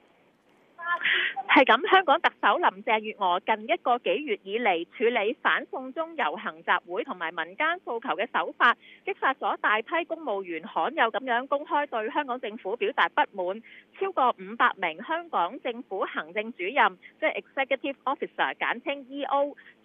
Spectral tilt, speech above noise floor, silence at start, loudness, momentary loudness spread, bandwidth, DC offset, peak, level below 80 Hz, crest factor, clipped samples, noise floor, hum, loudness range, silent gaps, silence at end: -5.5 dB/octave; 35 dB; 0.8 s; -27 LUFS; 10 LU; 6.6 kHz; under 0.1%; -6 dBFS; -90 dBFS; 22 dB; under 0.1%; -62 dBFS; none; 5 LU; none; 0.15 s